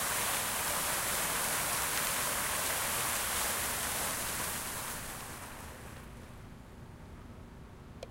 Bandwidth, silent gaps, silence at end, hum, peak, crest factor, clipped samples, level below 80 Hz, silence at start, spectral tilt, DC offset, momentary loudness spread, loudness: 16 kHz; none; 0 s; none; -18 dBFS; 18 dB; under 0.1%; -54 dBFS; 0 s; -1 dB/octave; under 0.1%; 20 LU; -32 LUFS